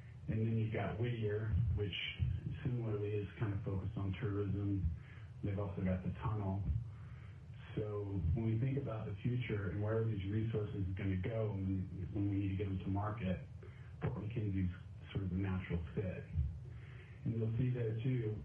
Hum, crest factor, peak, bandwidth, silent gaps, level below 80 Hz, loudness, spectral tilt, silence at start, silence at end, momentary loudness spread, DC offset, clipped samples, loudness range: none; 14 dB; -26 dBFS; 3.6 kHz; none; -54 dBFS; -40 LUFS; -9.5 dB/octave; 0 s; 0 s; 8 LU; under 0.1%; under 0.1%; 3 LU